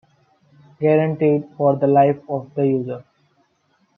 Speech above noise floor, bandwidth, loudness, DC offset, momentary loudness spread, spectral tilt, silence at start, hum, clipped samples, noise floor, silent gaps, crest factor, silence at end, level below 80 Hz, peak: 46 dB; 3.9 kHz; -19 LUFS; under 0.1%; 11 LU; -11 dB/octave; 0.8 s; none; under 0.1%; -64 dBFS; none; 18 dB; 0.95 s; -68 dBFS; -2 dBFS